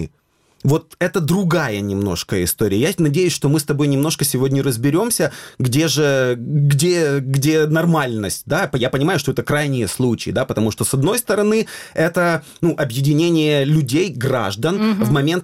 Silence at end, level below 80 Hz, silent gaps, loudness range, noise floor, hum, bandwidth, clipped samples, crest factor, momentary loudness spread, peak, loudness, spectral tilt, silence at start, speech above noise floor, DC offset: 0 s; -48 dBFS; none; 2 LU; -59 dBFS; none; 16 kHz; under 0.1%; 12 dB; 5 LU; -6 dBFS; -18 LUFS; -5.5 dB/octave; 0 s; 42 dB; under 0.1%